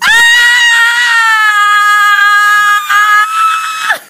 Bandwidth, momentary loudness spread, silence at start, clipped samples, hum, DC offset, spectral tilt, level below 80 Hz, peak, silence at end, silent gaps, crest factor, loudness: 16 kHz; 6 LU; 0 s; 0.3%; none; under 0.1%; 3 dB/octave; -54 dBFS; 0 dBFS; 0.1 s; none; 8 dB; -6 LUFS